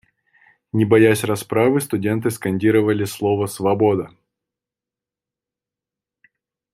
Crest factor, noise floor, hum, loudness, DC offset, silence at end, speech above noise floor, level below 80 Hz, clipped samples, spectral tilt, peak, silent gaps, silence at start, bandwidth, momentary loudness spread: 18 dB; -88 dBFS; none; -19 LUFS; under 0.1%; 2.65 s; 71 dB; -60 dBFS; under 0.1%; -6.5 dB/octave; -2 dBFS; none; 0.75 s; 15.5 kHz; 8 LU